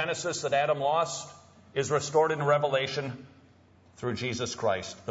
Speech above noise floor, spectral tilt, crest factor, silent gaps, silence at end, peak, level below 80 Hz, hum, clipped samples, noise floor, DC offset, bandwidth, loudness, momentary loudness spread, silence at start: 30 dB; -4 dB/octave; 16 dB; none; 0 s; -12 dBFS; -66 dBFS; none; under 0.1%; -59 dBFS; under 0.1%; 8 kHz; -29 LUFS; 12 LU; 0 s